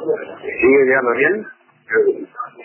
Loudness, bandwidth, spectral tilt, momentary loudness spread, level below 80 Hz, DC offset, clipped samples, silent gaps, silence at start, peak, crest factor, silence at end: -16 LUFS; 3.2 kHz; -9.5 dB/octave; 14 LU; -56 dBFS; under 0.1%; under 0.1%; none; 0 s; -4 dBFS; 14 dB; 0 s